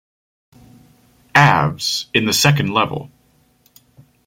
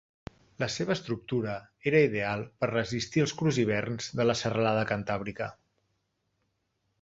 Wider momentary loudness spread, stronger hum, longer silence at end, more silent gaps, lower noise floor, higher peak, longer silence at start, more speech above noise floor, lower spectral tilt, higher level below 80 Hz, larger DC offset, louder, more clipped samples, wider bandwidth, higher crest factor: about the same, 9 LU vs 10 LU; neither; second, 1.2 s vs 1.5 s; neither; second, -57 dBFS vs -77 dBFS; first, 0 dBFS vs -10 dBFS; first, 1.35 s vs 0.6 s; second, 41 dB vs 49 dB; second, -4 dB/octave vs -5.5 dB/octave; first, -52 dBFS vs -60 dBFS; neither; first, -15 LUFS vs -29 LUFS; neither; first, 16.5 kHz vs 8 kHz; about the same, 20 dB vs 20 dB